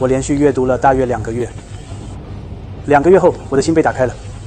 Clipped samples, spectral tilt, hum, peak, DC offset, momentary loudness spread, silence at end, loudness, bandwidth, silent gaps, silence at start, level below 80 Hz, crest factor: under 0.1%; -6.5 dB/octave; none; 0 dBFS; 0.1%; 20 LU; 0 s; -14 LUFS; 9.6 kHz; none; 0 s; -34 dBFS; 14 dB